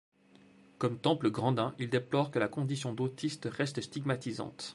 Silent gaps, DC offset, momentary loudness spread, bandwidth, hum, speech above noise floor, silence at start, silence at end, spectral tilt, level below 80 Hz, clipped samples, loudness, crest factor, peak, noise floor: none; under 0.1%; 6 LU; 11.5 kHz; none; 28 dB; 0.8 s; 0 s; -6 dB/octave; -72 dBFS; under 0.1%; -33 LUFS; 22 dB; -12 dBFS; -61 dBFS